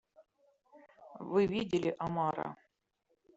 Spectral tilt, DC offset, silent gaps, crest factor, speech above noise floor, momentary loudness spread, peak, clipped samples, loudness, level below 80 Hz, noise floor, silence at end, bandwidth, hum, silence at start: -5.5 dB/octave; under 0.1%; none; 20 dB; 47 dB; 19 LU; -18 dBFS; under 0.1%; -34 LUFS; -70 dBFS; -80 dBFS; 0.8 s; 8 kHz; none; 0.2 s